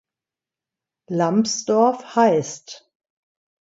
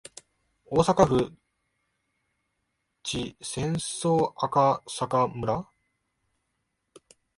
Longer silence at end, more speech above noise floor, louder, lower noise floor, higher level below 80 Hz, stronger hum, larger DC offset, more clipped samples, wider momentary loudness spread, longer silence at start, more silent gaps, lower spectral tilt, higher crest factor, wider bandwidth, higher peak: second, 0.85 s vs 1.75 s; first, 70 dB vs 53 dB; first, -19 LUFS vs -26 LUFS; first, -89 dBFS vs -78 dBFS; second, -72 dBFS vs -54 dBFS; neither; neither; neither; first, 15 LU vs 11 LU; first, 1.1 s vs 0.7 s; neither; about the same, -5 dB/octave vs -5.5 dB/octave; second, 18 dB vs 24 dB; second, 8 kHz vs 11.5 kHz; about the same, -4 dBFS vs -6 dBFS